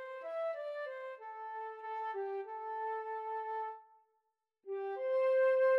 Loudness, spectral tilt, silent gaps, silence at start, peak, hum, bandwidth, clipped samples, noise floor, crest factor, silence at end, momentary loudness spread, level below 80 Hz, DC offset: -38 LUFS; -2.5 dB/octave; none; 0 s; -24 dBFS; none; 5.6 kHz; under 0.1%; -83 dBFS; 14 dB; 0 s; 15 LU; under -90 dBFS; under 0.1%